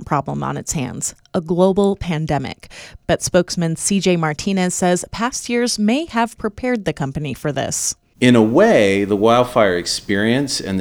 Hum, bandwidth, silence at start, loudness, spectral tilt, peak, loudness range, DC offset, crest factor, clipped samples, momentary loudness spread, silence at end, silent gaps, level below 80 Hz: none; 20 kHz; 0 s; -18 LUFS; -4.5 dB/octave; 0 dBFS; 5 LU; under 0.1%; 18 dB; under 0.1%; 10 LU; 0 s; none; -44 dBFS